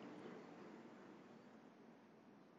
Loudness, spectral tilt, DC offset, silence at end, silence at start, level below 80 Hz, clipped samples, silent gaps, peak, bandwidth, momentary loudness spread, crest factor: -61 LUFS; -5 dB/octave; under 0.1%; 0 s; 0 s; under -90 dBFS; under 0.1%; none; -42 dBFS; 7.4 kHz; 9 LU; 18 dB